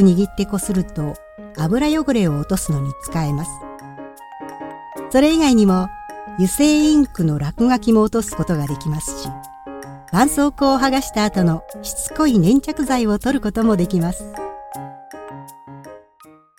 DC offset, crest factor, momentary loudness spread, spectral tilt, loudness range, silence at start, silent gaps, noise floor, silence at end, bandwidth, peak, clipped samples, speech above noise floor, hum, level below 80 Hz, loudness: under 0.1%; 18 dB; 21 LU; -5.5 dB/octave; 5 LU; 0 s; none; -48 dBFS; 0.6 s; 17 kHz; -2 dBFS; under 0.1%; 31 dB; none; -38 dBFS; -18 LUFS